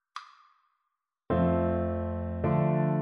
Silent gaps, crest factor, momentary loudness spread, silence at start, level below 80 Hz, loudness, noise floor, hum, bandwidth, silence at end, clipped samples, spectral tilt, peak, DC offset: none; 14 dB; 10 LU; 0.15 s; -48 dBFS; -29 LUFS; -83 dBFS; none; 6 kHz; 0 s; under 0.1%; -10 dB/octave; -14 dBFS; under 0.1%